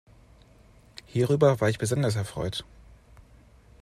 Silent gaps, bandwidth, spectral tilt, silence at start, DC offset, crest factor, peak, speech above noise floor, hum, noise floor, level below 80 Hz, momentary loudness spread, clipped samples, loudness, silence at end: none; 13.5 kHz; -6 dB/octave; 1.15 s; under 0.1%; 20 dB; -8 dBFS; 31 dB; none; -55 dBFS; -54 dBFS; 16 LU; under 0.1%; -26 LUFS; 1.2 s